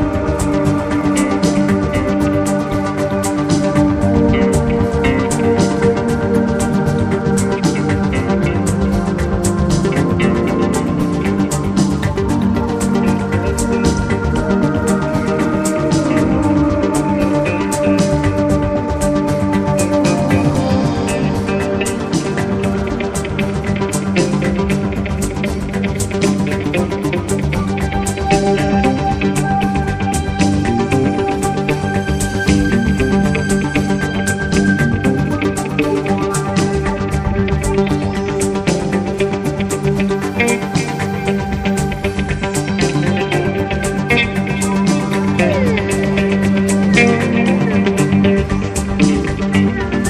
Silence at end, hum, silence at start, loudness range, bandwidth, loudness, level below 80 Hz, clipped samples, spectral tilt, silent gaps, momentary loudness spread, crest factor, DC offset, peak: 0 s; none; 0 s; 3 LU; 15 kHz; -16 LUFS; -28 dBFS; under 0.1%; -6 dB/octave; none; 4 LU; 14 dB; under 0.1%; 0 dBFS